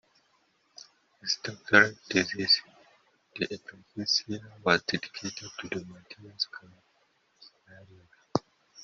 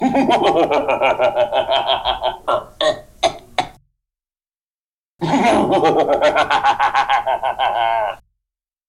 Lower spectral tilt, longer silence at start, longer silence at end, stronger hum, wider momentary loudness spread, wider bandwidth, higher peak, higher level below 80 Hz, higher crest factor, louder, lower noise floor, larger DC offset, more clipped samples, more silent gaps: second, -1 dB/octave vs -4.5 dB/octave; first, 1.25 s vs 0 s; second, 0 s vs 0.75 s; neither; first, 25 LU vs 7 LU; second, 7.6 kHz vs 13.5 kHz; about the same, -4 dBFS vs -4 dBFS; second, -72 dBFS vs -48 dBFS; first, 28 dB vs 14 dB; second, -28 LUFS vs -17 LUFS; second, -70 dBFS vs under -90 dBFS; neither; neither; second, none vs 4.63-5.19 s